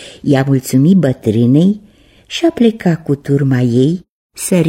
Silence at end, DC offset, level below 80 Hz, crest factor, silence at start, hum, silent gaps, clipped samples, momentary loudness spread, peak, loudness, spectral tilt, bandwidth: 0 s; under 0.1%; -50 dBFS; 12 dB; 0 s; none; 4.09-4.30 s; under 0.1%; 8 LU; 0 dBFS; -13 LUFS; -7 dB/octave; 16.5 kHz